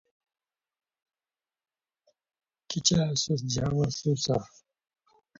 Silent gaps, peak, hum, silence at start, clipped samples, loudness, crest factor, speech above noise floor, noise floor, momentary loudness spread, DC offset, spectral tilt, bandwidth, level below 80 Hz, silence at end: none; -10 dBFS; none; 2.7 s; under 0.1%; -28 LUFS; 22 dB; over 63 dB; under -90 dBFS; 6 LU; under 0.1%; -4.5 dB/octave; 7.8 kHz; -56 dBFS; 0.95 s